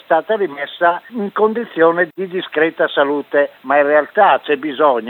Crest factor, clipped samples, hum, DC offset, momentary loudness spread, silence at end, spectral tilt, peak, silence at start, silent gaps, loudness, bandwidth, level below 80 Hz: 14 dB; under 0.1%; none; under 0.1%; 7 LU; 0 s; -7.5 dB/octave; -2 dBFS; 0.1 s; none; -16 LUFS; 4.2 kHz; -76 dBFS